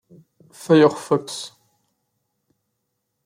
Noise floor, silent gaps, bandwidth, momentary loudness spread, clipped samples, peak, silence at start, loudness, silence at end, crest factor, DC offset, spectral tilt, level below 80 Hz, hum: -76 dBFS; none; 15.5 kHz; 21 LU; under 0.1%; -4 dBFS; 0.7 s; -18 LUFS; 1.8 s; 20 dB; under 0.1%; -6 dB/octave; -72 dBFS; none